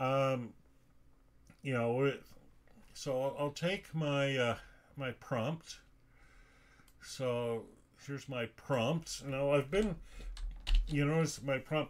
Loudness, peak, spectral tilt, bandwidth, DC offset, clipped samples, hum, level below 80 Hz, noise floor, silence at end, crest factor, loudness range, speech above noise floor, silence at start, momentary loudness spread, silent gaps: -36 LUFS; -18 dBFS; -5.5 dB/octave; 16 kHz; under 0.1%; under 0.1%; none; -46 dBFS; -63 dBFS; 0 s; 18 dB; 6 LU; 28 dB; 0 s; 16 LU; none